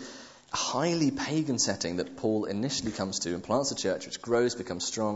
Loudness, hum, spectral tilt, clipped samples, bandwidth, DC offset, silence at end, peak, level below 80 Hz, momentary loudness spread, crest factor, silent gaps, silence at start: -30 LUFS; none; -4 dB/octave; under 0.1%; 8.2 kHz; under 0.1%; 0 s; -12 dBFS; -62 dBFS; 5 LU; 18 dB; none; 0 s